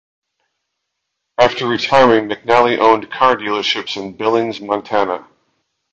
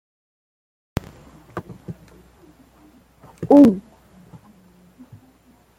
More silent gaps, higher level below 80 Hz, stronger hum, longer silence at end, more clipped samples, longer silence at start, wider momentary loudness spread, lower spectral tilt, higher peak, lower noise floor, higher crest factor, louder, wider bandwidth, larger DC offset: neither; second, -56 dBFS vs -50 dBFS; neither; second, 0.7 s vs 2 s; neither; second, 1.4 s vs 1.55 s; second, 10 LU vs 27 LU; second, -4.5 dB/octave vs -8.5 dB/octave; about the same, 0 dBFS vs -2 dBFS; first, -75 dBFS vs -55 dBFS; about the same, 16 dB vs 20 dB; about the same, -15 LUFS vs -16 LUFS; second, 8.2 kHz vs 9.6 kHz; neither